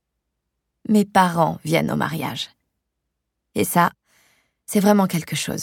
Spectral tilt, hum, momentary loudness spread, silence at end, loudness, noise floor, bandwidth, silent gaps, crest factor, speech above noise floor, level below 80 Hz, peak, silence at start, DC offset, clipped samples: -5 dB/octave; none; 12 LU; 0 s; -20 LUFS; -78 dBFS; 18 kHz; none; 20 dB; 59 dB; -58 dBFS; -2 dBFS; 0.9 s; under 0.1%; under 0.1%